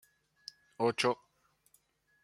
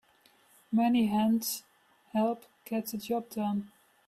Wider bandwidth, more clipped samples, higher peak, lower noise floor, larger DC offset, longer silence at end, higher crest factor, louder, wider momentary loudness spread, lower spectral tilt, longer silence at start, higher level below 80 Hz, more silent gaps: second, 14.5 kHz vs 16 kHz; neither; first, -14 dBFS vs -18 dBFS; first, -72 dBFS vs -64 dBFS; neither; first, 1.1 s vs 0.4 s; first, 24 dB vs 14 dB; about the same, -33 LUFS vs -31 LUFS; first, 21 LU vs 11 LU; about the same, -4 dB/octave vs -5 dB/octave; about the same, 0.8 s vs 0.7 s; second, -82 dBFS vs -72 dBFS; neither